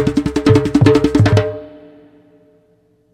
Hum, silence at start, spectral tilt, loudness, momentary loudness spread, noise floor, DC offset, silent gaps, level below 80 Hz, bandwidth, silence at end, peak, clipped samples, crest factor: none; 0 s; -7.5 dB/octave; -13 LUFS; 9 LU; -56 dBFS; under 0.1%; none; -36 dBFS; 11 kHz; 1.45 s; 0 dBFS; under 0.1%; 16 dB